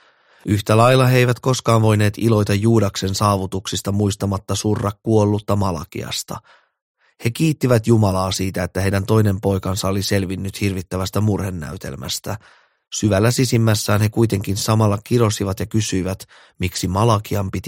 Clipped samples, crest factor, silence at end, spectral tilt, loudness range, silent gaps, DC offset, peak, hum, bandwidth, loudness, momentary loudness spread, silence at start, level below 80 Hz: under 0.1%; 18 dB; 0 s; -5.5 dB/octave; 5 LU; 6.82-6.95 s; under 0.1%; -2 dBFS; none; 16.5 kHz; -19 LUFS; 10 LU; 0.45 s; -46 dBFS